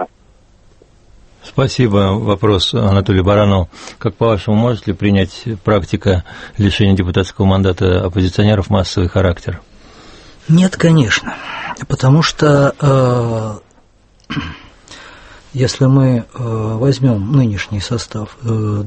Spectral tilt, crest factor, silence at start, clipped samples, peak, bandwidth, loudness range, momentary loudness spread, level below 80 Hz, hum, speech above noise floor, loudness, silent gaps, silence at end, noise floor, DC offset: -6.5 dB/octave; 14 dB; 0 s; under 0.1%; 0 dBFS; 8.8 kHz; 3 LU; 13 LU; -36 dBFS; none; 36 dB; -14 LUFS; none; 0 s; -49 dBFS; under 0.1%